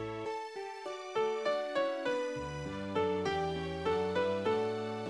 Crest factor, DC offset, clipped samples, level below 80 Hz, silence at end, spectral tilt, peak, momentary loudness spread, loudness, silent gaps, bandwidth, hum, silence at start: 14 dB; under 0.1%; under 0.1%; -60 dBFS; 0 s; -5.5 dB/octave; -20 dBFS; 8 LU; -35 LUFS; none; 11 kHz; none; 0 s